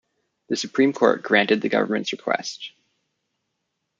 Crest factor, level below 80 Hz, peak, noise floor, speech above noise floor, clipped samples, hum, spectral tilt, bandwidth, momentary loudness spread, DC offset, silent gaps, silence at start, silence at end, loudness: 22 dB; -72 dBFS; -2 dBFS; -78 dBFS; 56 dB; under 0.1%; none; -4 dB/octave; 8.6 kHz; 13 LU; under 0.1%; none; 0.5 s; 1.3 s; -21 LUFS